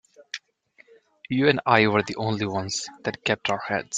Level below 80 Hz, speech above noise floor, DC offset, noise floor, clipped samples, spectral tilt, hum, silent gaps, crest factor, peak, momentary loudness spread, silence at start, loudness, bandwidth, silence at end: -62 dBFS; 35 dB; under 0.1%; -59 dBFS; under 0.1%; -4.5 dB/octave; none; none; 22 dB; -2 dBFS; 19 LU; 0.35 s; -24 LUFS; 9.6 kHz; 0 s